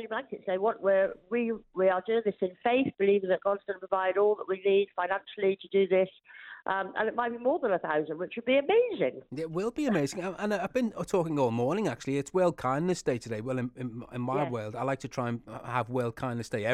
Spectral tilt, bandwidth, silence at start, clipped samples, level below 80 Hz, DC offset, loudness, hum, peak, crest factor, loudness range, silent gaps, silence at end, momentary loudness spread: -6 dB/octave; 12.5 kHz; 0 s; under 0.1%; -64 dBFS; under 0.1%; -30 LUFS; none; -14 dBFS; 16 dB; 3 LU; none; 0 s; 8 LU